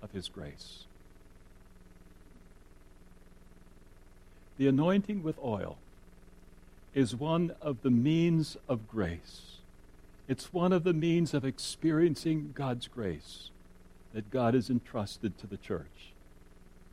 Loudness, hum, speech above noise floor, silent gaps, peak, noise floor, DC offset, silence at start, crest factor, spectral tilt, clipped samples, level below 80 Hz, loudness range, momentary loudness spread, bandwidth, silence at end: -32 LUFS; none; 24 dB; none; -14 dBFS; -55 dBFS; under 0.1%; 0 s; 18 dB; -7 dB/octave; under 0.1%; -56 dBFS; 5 LU; 20 LU; 13.5 kHz; 0.1 s